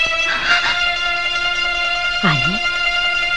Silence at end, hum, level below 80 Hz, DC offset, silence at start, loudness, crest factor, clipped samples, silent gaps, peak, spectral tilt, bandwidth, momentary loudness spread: 0 s; none; -40 dBFS; 2%; 0 s; -16 LUFS; 16 dB; under 0.1%; none; 0 dBFS; -3 dB/octave; 10.5 kHz; 3 LU